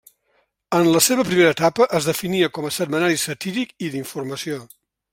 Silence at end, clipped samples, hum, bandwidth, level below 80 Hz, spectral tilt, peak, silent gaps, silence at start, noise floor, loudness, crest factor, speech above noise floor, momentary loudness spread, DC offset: 0.5 s; under 0.1%; none; 16.5 kHz; -60 dBFS; -4 dB/octave; 0 dBFS; none; 0.7 s; -66 dBFS; -20 LUFS; 20 dB; 46 dB; 13 LU; under 0.1%